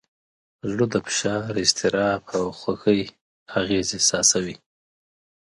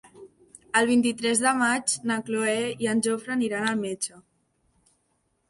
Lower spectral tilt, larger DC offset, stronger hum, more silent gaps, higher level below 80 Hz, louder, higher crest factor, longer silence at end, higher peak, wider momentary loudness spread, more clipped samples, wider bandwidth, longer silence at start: about the same, -3 dB/octave vs -3 dB/octave; neither; neither; first, 3.21-3.46 s vs none; first, -54 dBFS vs -70 dBFS; first, -22 LUFS vs -25 LUFS; about the same, 22 dB vs 18 dB; second, 0.95 s vs 1.3 s; first, -2 dBFS vs -8 dBFS; first, 11 LU vs 6 LU; neither; about the same, 11.5 kHz vs 11.5 kHz; first, 0.65 s vs 0.15 s